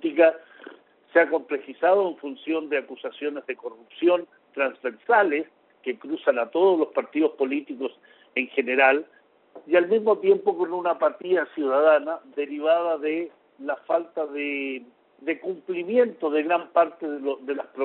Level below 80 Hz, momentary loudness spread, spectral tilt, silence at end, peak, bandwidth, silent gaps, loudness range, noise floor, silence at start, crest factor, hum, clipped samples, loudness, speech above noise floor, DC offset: -76 dBFS; 13 LU; -2 dB/octave; 0 s; -4 dBFS; 4.2 kHz; none; 5 LU; -48 dBFS; 0.05 s; 20 dB; none; under 0.1%; -24 LUFS; 25 dB; under 0.1%